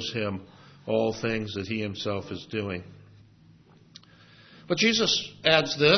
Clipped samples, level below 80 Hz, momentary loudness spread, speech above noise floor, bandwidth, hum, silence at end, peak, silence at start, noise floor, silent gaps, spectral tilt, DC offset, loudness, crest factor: under 0.1%; -64 dBFS; 13 LU; 29 dB; 6.4 kHz; none; 0 s; -4 dBFS; 0 s; -56 dBFS; none; -4 dB/octave; under 0.1%; -26 LUFS; 24 dB